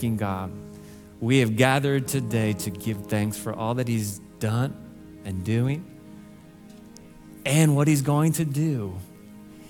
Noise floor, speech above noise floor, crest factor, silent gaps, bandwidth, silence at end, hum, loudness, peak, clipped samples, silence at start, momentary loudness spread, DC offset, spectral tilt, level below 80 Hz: -47 dBFS; 23 dB; 20 dB; none; 18 kHz; 0 s; none; -25 LUFS; -4 dBFS; under 0.1%; 0 s; 23 LU; under 0.1%; -6 dB/octave; -58 dBFS